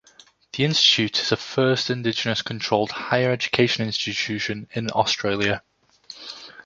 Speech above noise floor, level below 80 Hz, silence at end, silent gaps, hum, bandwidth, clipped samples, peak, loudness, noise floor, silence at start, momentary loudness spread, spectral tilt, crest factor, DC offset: 31 dB; -58 dBFS; 0.05 s; none; none; 7.8 kHz; under 0.1%; -2 dBFS; -22 LUFS; -54 dBFS; 0.55 s; 15 LU; -4 dB/octave; 22 dB; under 0.1%